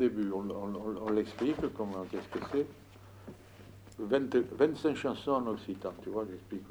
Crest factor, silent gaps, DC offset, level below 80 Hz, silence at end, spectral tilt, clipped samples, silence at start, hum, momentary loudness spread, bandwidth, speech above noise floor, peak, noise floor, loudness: 20 dB; none; under 0.1%; -62 dBFS; 0 s; -7 dB/octave; under 0.1%; 0 s; none; 22 LU; over 20 kHz; 20 dB; -14 dBFS; -53 dBFS; -34 LUFS